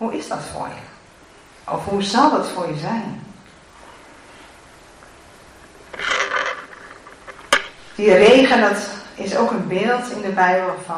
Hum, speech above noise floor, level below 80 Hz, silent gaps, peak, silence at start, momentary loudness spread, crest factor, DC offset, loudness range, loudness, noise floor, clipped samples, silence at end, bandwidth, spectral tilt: none; 29 dB; -54 dBFS; none; -2 dBFS; 0 s; 25 LU; 20 dB; under 0.1%; 14 LU; -18 LUFS; -47 dBFS; under 0.1%; 0 s; 13.5 kHz; -4 dB/octave